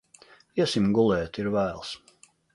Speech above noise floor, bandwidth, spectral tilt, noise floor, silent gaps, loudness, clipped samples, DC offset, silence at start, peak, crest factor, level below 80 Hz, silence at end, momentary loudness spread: 31 dB; 11.5 kHz; -6 dB/octave; -56 dBFS; none; -26 LUFS; under 0.1%; under 0.1%; 0.55 s; -10 dBFS; 18 dB; -54 dBFS; 0.6 s; 15 LU